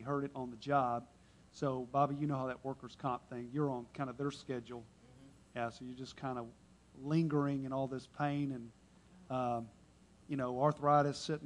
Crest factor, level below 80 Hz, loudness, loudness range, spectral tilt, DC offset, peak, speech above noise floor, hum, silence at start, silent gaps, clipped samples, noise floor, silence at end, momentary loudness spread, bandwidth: 22 dB; -70 dBFS; -38 LUFS; 5 LU; -7 dB/octave; under 0.1%; -16 dBFS; 26 dB; none; 0 s; none; under 0.1%; -64 dBFS; 0 s; 15 LU; 11 kHz